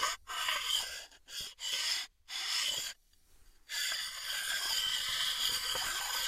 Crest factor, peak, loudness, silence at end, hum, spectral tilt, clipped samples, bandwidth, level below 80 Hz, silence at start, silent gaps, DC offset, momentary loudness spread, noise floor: 20 dB; -18 dBFS; -34 LUFS; 0 s; none; 2.5 dB/octave; under 0.1%; 16 kHz; -64 dBFS; 0 s; none; under 0.1%; 11 LU; -63 dBFS